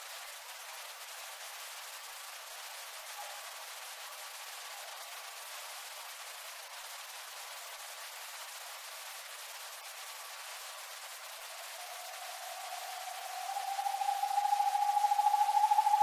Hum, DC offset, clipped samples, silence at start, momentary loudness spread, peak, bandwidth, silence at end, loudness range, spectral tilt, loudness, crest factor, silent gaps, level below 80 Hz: none; under 0.1%; under 0.1%; 0 s; 14 LU; -18 dBFS; 16 kHz; 0 s; 10 LU; 6.5 dB/octave; -38 LUFS; 20 dB; none; under -90 dBFS